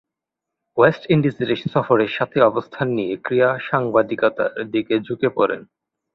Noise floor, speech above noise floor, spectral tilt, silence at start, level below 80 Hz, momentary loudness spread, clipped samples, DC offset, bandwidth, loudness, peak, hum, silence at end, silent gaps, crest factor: -84 dBFS; 65 dB; -9 dB/octave; 0.75 s; -58 dBFS; 7 LU; under 0.1%; under 0.1%; 6.2 kHz; -20 LUFS; -2 dBFS; none; 0.55 s; none; 18 dB